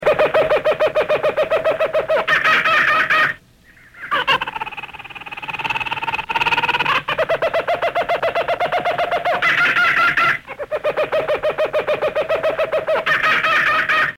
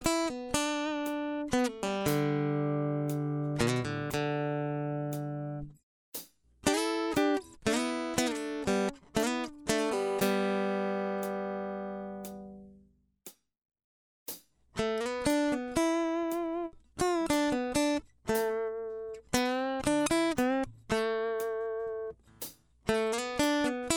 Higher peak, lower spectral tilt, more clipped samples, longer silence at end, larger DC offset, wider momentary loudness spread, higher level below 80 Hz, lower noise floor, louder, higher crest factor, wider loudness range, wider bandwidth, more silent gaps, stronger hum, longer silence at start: first, -4 dBFS vs -10 dBFS; about the same, -3.5 dB/octave vs -4.5 dB/octave; neither; about the same, 0 s vs 0 s; neither; second, 10 LU vs 14 LU; first, -50 dBFS vs -56 dBFS; second, -48 dBFS vs -64 dBFS; first, -17 LUFS vs -32 LUFS; second, 14 dB vs 22 dB; about the same, 4 LU vs 5 LU; second, 16.5 kHz vs 19.5 kHz; second, none vs 5.83-6.12 s, 13.84-14.26 s; neither; about the same, 0 s vs 0 s